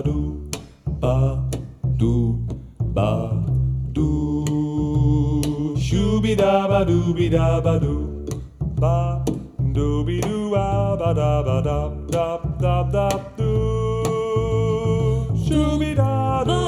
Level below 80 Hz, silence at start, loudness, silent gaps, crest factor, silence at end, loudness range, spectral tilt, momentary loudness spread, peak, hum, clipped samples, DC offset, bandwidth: -30 dBFS; 0 s; -21 LUFS; none; 16 dB; 0 s; 3 LU; -7.5 dB/octave; 8 LU; -4 dBFS; none; under 0.1%; under 0.1%; 14 kHz